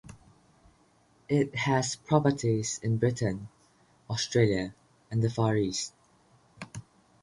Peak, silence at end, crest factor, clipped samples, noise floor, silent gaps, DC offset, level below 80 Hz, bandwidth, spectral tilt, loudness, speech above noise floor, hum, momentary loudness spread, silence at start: -10 dBFS; 0.4 s; 22 dB; under 0.1%; -64 dBFS; none; under 0.1%; -58 dBFS; 11.5 kHz; -5.5 dB/octave; -29 LUFS; 37 dB; none; 18 LU; 0.05 s